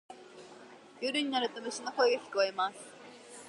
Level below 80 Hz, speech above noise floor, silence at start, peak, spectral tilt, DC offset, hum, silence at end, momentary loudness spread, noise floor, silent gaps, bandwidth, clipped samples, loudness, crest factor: -88 dBFS; 21 dB; 0.1 s; -14 dBFS; -2 dB/octave; under 0.1%; none; 0 s; 23 LU; -53 dBFS; none; 11.5 kHz; under 0.1%; -32 LUFS; 20 dB